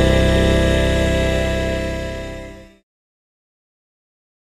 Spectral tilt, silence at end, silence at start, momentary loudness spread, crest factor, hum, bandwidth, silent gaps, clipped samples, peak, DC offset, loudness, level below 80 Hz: -6 dB/octave; 1.8 s; 0 s; 16 LU; 16 dB; none; 14 kHz; none; under 0.1%; -2 dBFS; under 0.1%; -18 LUFS; -24 dBFS